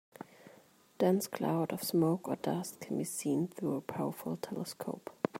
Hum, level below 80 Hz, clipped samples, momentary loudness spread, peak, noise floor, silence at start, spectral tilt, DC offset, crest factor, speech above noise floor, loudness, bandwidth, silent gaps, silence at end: none; -78 dBFS; under 0.1%; 10 LU; -14 dBFS; -62 dBFS; 0.2 s; -6 dB/octave; under 0.1%; 22 dB; 28 dB; -35 LUFS; 16 kHz; none; 0 s